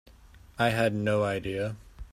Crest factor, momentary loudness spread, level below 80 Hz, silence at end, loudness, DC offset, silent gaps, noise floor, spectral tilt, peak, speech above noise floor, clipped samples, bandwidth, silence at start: 18 dB; 15 LU; -52 dBFS; 0.05 s; -28 LUFS; under 0.1%; none; -53 dBFS; -6 dB/octave; -10 dBFS; 26 dB; under 0.1%; 15 kHz; 0.35 s